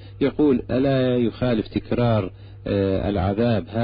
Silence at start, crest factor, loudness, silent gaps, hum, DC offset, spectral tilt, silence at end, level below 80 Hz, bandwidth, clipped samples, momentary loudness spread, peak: 0 s; 12 dB; -22 LUFS; none; none; under 0.1%; -12.5 dB/octave; 0 s; -40 dBFS; 5.2 kHz; under 0.1%; 5 LU; -10 dBFS